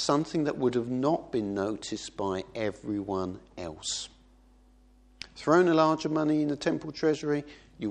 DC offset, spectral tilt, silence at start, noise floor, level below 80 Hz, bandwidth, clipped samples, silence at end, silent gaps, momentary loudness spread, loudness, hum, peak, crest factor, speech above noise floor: under 0.1%; -5 dB/octave; 0 s; -59 dBFS; -60 dBFS; 9.8 kHz; under 0.1%; 0 s; none; 14 LU; -29 LUFS; none; -8 dBFS; 22 dB; 30 dB